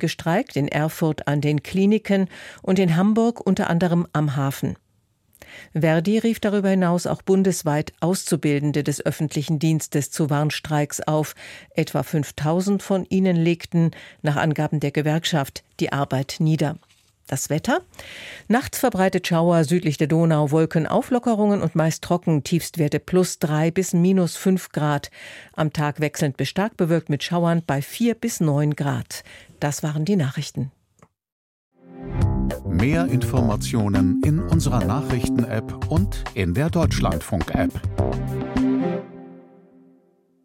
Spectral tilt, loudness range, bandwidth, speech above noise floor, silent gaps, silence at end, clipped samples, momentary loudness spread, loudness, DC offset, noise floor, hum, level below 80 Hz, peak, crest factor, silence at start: -6 dB/octave; 4 LU; 16.5 kHz; 43 dB; 31.32-31.71 s; 1.05 s; under 0.1%; 8 LU; -22 LUFS; under 0.1%; -64 dBFS; none; -40 dBFS; -6 dBFS; 16 dB; 0 s